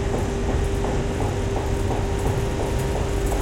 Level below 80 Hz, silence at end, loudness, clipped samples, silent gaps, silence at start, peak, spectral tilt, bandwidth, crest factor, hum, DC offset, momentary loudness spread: -28 dBFS; 0 s; -25 LUFS; under 0.1%; none; 0 s; -10 dBFS; -6 dB/octave; 17 kHz; 12 dB; none; under 0.1%; 1 LU